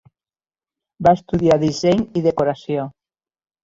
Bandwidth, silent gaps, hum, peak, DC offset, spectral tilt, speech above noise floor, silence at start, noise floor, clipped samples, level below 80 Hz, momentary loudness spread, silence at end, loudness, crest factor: 7.8 kHz; none; none; -2 dBFS; under 0.1%; -7 dB/octave; over 73 dB; 1 s; under -90 dBFS; under 0.1%; -46 dBFS; 9 LU; 0.75 s; -18 LUFS; 18 dB